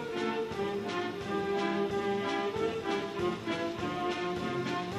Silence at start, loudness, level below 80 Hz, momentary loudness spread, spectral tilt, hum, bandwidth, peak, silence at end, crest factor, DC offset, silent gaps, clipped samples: 0 s; -33 LUFS; -62 dBFS; 3 LU; -5.5 dB/octave; none; 14 kHz; -20 dBFS; 0 s; 14 dB; under 0.1%; none; under 0.1%